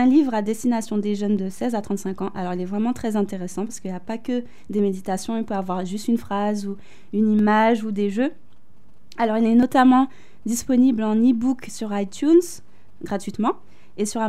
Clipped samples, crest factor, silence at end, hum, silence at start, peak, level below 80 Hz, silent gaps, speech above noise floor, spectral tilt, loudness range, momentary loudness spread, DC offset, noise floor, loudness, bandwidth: under 0.1%; 16 dB; 0 s; none; 0 s; -6 dBFS; -58 dBFS; none; 36 dB; -6 dB/octave; 7 LU; 12 LU; 2%; -57 dBFS; -22 LUFS; 14.5 kHz